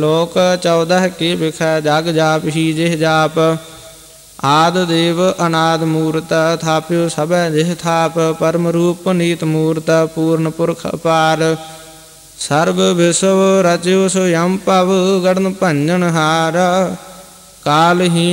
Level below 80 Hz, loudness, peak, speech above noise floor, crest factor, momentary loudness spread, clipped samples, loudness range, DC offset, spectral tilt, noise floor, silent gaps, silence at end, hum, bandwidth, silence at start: -52 dBFS; -14 LUFS; -2 dBFS; 26 dB; 12 dB; 5 LU; under 0.1%; 3 LU; under 0.1%; -5 dB/octave; -39 dBFS; none; 0 s; none; 16.5 kHz; 0 s